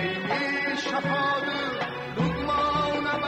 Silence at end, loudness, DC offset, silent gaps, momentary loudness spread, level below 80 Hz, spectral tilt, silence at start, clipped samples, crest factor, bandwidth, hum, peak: 0 s; -26 LUFS; under 0.1%; none; 4 LU; -50 dBFS; -5.5 dB/octave; 0 s; under 0.1%; 14 dB; 9.8 kHz; none; -12 dBFS